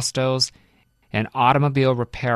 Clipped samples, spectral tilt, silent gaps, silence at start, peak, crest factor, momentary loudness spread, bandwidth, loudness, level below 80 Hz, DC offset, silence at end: under 0.1%; -5 dB/octave; none; 0 s; -2 dBFS; 18 dB; 8 LU; 13.5 kHz; -20 LUFS; -50 dBFS; under 0.1%; 0 s